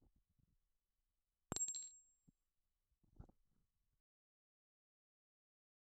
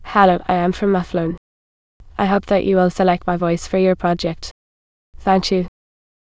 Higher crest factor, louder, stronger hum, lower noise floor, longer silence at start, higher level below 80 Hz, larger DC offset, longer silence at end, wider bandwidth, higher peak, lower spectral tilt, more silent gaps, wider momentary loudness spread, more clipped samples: first, 36 dB vs 18 dB; second, -45 LUFS vs -18 LUFS; neither; about the same, under -90 dBFS vs under -90 dBFS; first, 1.5 s vs 0 s; second, -76 dBFS vs -42 dBFS; second, under 0.1% vs 0.2%; first, 2.75 s vs 0.6 s; first, 11.5 kHz vs 8 kHz; second, -22 dBFS vs 0 dBFS; second, -1.5 dB/octave vs -6.5 dB/octave; second, none vs 1.38-2.00 s, 4.51-5.13 s; first, 24 LU vs 12 LU; neither